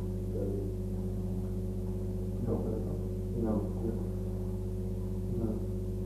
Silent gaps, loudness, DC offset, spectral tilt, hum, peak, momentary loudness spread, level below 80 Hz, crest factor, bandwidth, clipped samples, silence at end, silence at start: none; -35 LUFS; under 0.1%; -9.5 dB/octave; 50 Hz at -35 dBFS; -20 dBFS; 4 LU; -40 dBFS; 14 dB; 13.5 kHz; under 0.1%; 0 s; 0 s